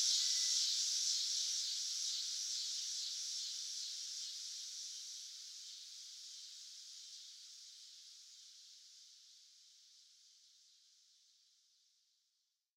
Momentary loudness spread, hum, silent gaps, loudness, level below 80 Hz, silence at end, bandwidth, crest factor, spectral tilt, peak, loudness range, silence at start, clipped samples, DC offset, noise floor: 23 LU; none; none; -39 LUFS; under -90 dBFS; 2.3 s; 16 kHz; 22 dB; 9.5 dB/octave; -22 dBFS; 23 LU; 0 s; under 0.1%; under 0.1%; -85 dBFS